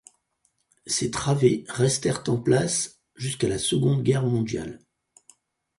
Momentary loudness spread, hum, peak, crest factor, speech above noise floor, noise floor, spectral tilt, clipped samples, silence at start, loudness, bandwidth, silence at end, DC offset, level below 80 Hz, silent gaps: 11 LU; none; -6 dBFS; 20 dB; 48 dB; -71 dBFS; -5 dB/octave; under 0.1%; 0.85 s; -24 LUFS; 11.5 kHz; 1 s; under 0.1%; -54 dBFS; none